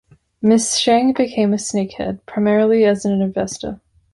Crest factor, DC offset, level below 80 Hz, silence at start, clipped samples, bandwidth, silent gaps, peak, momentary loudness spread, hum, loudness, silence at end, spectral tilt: 16 dB; under 0.1%; -50 dBFS; 0.4 s; under 0.1%; 11.5 kHz; none; -2 dBFS; 11 LU; none; -17 LUFS; 0.4 s; -4.5 dB/octave